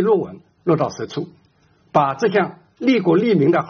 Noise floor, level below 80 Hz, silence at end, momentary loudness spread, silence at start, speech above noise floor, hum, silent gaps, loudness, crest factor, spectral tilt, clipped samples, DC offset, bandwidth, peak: -57 dBFS; -62 dBFS; 0 s; 13 LU; 0 s; 39 dB; none; none; -19 LUFS; 18 dB; -6 dB/octave; under 0.1%; under 0.1%; 6.8 kHz; 0 dBFS